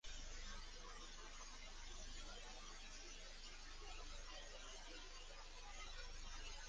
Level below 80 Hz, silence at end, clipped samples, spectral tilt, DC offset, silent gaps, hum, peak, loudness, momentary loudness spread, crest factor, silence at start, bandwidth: -56 dBFS; 0 s; under 0.1%; -1.5 dB/octave; under 0.1%; none; none; -40 dBFS; -56 LUFS; 2 LU; 14 dB; 0.05 s; 10 kHz